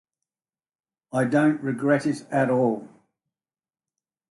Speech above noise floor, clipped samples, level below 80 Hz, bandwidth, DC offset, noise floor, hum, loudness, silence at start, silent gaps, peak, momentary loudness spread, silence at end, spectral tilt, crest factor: over 68 dB; under 0.1%; -72 dBFS; 11.5 kHz; under 0.1%; under -90 dBFS; none; -24 LUFS; 1.15 s; none; -8 dBFS; 6 LU; 1.45 s; -7.5 dB/octave; 18 dB